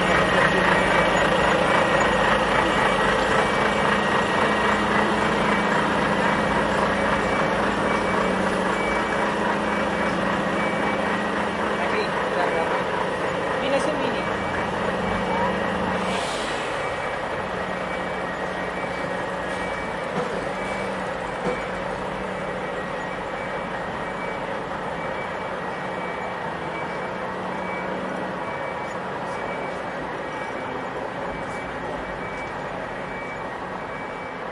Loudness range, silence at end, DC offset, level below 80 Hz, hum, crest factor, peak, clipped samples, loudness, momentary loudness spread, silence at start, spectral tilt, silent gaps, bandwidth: 9 LU; 0 s; under 0.1%; -46 dBFS; none; 18 dB; -6 dBFS; under 0.1%; -24 LUFS; 10 LU; 0 s; -5 dB/octave; none; 11.5 kHz